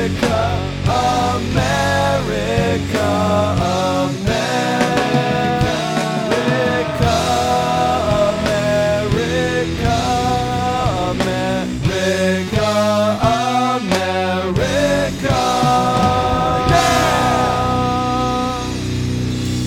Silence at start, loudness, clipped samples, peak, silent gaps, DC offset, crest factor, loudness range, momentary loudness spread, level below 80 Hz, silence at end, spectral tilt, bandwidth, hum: 0 s; -17 LUFS; under 0.1%; 0 dBFS; none; under 0.1%; 16 dB; 2 LU; 4 LU; -32 dBFS; 0 s; -5 dB/octave; 17.5 kHz; none